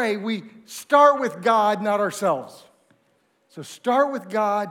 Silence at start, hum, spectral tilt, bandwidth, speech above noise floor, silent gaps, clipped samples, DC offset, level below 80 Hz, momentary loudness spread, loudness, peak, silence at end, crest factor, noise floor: 0 s; none; -4.5 dB/octave; 16.5 kHz; 44 dB; none; under 0.1%; under 0.1%; -82 dBFS; 22 LU; -21 LUFS; -2 dBFS; 0 s; 20 dB; -65 dBFS